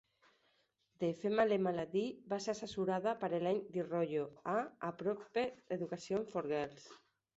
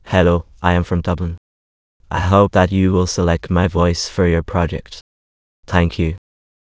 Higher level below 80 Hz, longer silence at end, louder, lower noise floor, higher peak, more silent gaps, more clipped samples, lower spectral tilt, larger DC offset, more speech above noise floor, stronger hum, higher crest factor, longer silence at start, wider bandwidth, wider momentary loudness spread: second, -76 dBFS vs -28 dBFS; second, 0.4 s vs 0.6 s; second, -38 LUFS vs -17 LUFS; second, -78 dBFS vs under -90 dBFS; second, -20 dBFS vs 0 dBFS; second, none vs 1.38-2.00 s, 5.01-5.63 s; neither; second, -5 dB/octave vs -6.5 dB/octave; neither; second, 40 dB vs over 74 dB; neither; about the same, 20 dB vs 18 dB; first, 1 s vs 0.05 s; about the same, 8 kHz vs 8 kHz; second, 7 LU vs 12 LU